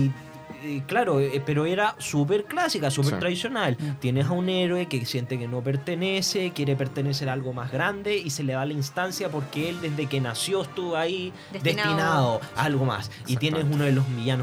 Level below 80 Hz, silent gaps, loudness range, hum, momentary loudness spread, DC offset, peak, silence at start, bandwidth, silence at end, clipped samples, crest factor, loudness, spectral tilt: -64 dBFS; none; 3 LU; none; 6 LU; under 0.1%; -8 dBFS; 0 s; 15.5 kHz; 0 s; under 0.1%; 18 dB; -26 LUFS; -5.5 dB/octave